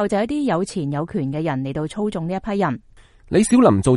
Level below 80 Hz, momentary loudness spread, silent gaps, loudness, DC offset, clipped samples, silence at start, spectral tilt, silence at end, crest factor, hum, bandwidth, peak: -46 dBFS; 10 LU; none; -21 LUFS; under 0.1%; under 0.1%; 0 s; -6.5 dB/octave; 0 s; 18 dB; none; 11.5 kHz; 0 dBFS